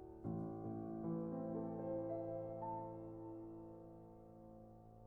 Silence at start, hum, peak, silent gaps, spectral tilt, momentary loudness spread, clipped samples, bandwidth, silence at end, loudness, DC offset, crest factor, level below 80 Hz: 0 s; none; -34 dBFS; none; -12 dB/octave; 15 LU; under 0.1%; 2.8 kHz; 0 s; -47 LUFS; under 0.1%; 14 dB; -70 dBFS